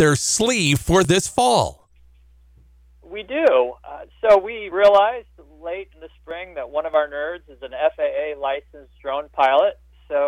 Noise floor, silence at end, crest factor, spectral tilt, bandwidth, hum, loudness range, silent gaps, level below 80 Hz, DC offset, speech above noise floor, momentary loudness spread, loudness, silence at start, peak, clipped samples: -52 dBFS; 0 s; 16 dB; -4 dB/octave; 16.5 kHz; none; 6 LU; none; -44 dBFS; under 0.1%; 32 dB; 18 LU; -19 LUFS; 0 s; -6 dBFS; under 0.1%